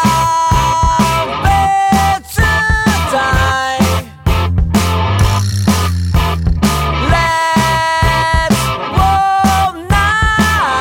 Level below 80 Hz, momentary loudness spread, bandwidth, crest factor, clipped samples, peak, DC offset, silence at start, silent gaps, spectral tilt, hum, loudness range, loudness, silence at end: -20 dBFS; 3 LU; 17 kHz; 12 dB; under 0.1%; 0 dBFS; under 0.1%; 0 s; none; -4.5 dB/octave; none; 2 LU; -12 LUFS; 0 s